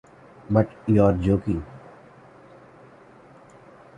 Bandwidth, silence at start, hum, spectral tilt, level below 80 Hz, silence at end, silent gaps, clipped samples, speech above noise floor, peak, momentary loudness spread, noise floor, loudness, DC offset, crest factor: 9.4 kHz; 0.5 s; none; -10 dB/octave; -44 dBFS; 2.2 s; none; under 0.1%; 29 dB; -4 dBFS; 18 LU; -50 dBFS; -22 LUFS; under 0.1%; 22 dB